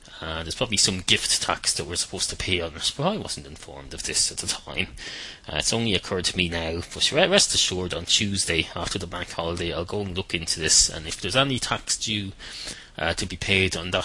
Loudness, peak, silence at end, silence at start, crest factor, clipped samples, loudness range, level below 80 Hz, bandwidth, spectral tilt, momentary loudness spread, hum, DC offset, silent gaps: -23 LUFS; 0 dBFS; 0 s; 0 s; 26 dB; under 0.1%; 4 LU; -46 dBFS; 11.5 kHz; -2 dB/octave; 14 LU; none; under 0.1%; none